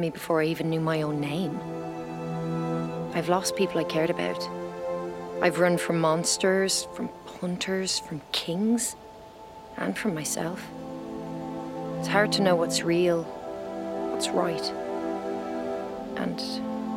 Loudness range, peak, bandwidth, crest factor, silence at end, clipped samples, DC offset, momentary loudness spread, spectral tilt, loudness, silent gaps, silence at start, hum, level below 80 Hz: 5 LU; -10 dBFS; 16 kHz; 18 dB; 0 s; under 0.1%; under 0.1%; 12 LU; -4 dB/octave; -28 LUFS; none; 0 s; none; -60 dBFS